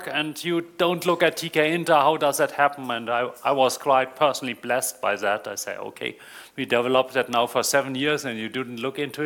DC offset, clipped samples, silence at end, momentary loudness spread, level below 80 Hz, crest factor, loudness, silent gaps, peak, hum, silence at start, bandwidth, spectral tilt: under 0.1%; under 0.1%; 0 s; 11 LU; -68 dBFS; 20 dB; -23 LUFS; none; -4 dBFS; none; 0 s; 18.5 kHz; -3.5 dB/octave